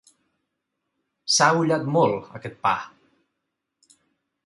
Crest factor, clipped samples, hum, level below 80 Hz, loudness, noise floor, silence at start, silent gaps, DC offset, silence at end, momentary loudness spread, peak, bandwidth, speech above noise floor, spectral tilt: 22 dB; under 0.1%; none; -66 dBFS; -21 LUFS; -81 dBFS; 1.25 s; none; under 0.1%; 1.6 s; 19 LU; -4 dBFS; 11.5 kHz; 59 dB; -3.5 dB/octave